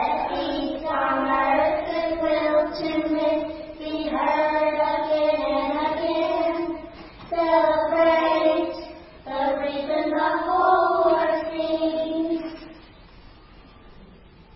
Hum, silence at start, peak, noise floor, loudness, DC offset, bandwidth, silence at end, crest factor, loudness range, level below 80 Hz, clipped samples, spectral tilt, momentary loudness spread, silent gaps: none; 0 s; -8 dBFS; -48 dBFS; -23 LUFS; under 0.1%; 5.8 kHz; 0.45 s; 16 dB; 2 LU; -50 dBFS; under 0.1%; -9 dB/octave; 12 LU; none